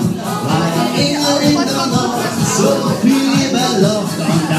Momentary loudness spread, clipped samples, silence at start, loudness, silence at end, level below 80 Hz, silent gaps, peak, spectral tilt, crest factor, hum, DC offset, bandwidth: 4 LU; under 0.1%; 0 s; -14 LUFS; 0 s; -50 dBFS; none; 0 dBFS; -4.5 dB/octave; 14 dB; none; under 0.1%; 15.5 kHz